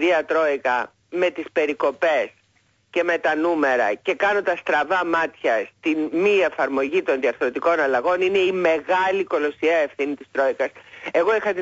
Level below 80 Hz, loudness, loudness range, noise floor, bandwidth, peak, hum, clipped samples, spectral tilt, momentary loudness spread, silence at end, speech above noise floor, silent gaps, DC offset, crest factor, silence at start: -64 dBFS; -21 LUFS; 2 LU; -63 dBFS; 7.8 kHz; -8 dBFS; none; under 0.1%; -4.5 dB/octave; 5 LU; 0 s; 42 dB; none; under 0.1%; 14 dB; 0 s